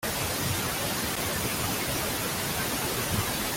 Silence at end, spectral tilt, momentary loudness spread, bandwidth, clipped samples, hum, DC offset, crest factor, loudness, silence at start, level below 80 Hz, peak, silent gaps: 0 s; -3 dB/octave; 1 LU; 17 kHz; under 0.1%; none; under 0.1%; 14 dB; -28 LUFS; 0 s; -46 dBFS; -16 dBFS; none